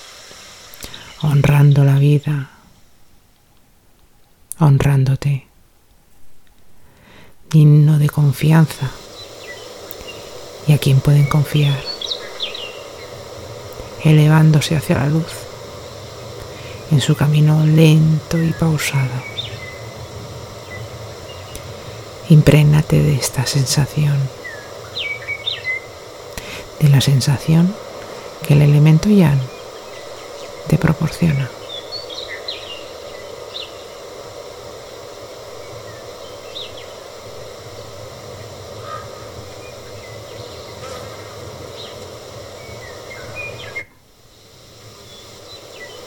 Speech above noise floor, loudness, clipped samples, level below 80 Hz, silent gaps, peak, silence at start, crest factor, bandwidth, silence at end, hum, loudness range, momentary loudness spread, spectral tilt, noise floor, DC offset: 39 dB; -15 LUFS; under 0.1%; -42 dBFS; none; 0 dBFS; 0.8 s; 18 dB; 16.5 kHz; 0 s; none; 17 LU; 22 LU; -6.5 dB/octave; -52 dBFS; under 0.1%